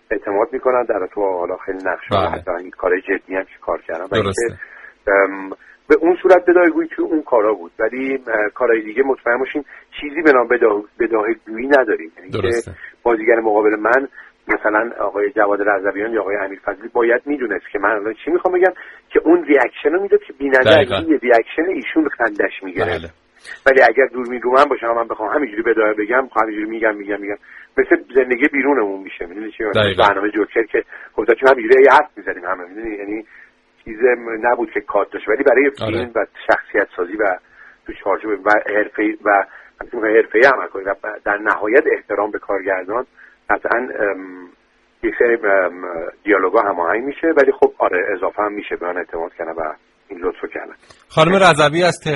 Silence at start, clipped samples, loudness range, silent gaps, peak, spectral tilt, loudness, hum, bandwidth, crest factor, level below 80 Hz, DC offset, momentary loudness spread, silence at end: 0.1 s; under 0.1%; 5 LU; none; 0 dBFS; -5.5 dB/octave; -17 LUFS; none; 11.5 kHz; 16 dB; -50 dBFS; under 0.1%; 13 LU; 0 s